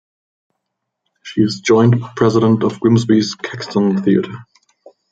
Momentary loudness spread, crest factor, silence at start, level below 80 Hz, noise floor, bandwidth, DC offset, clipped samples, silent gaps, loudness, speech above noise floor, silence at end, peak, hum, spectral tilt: 11 LU; 14 dB; 1.25 s; -56 dBFS; -76 dBFS; 7.8 kHz; under 0.1%; under 0.1%; none; -15 LUFS; 62 dB; 0.7 s; -2 dBFS; none; -6.5 dB/octave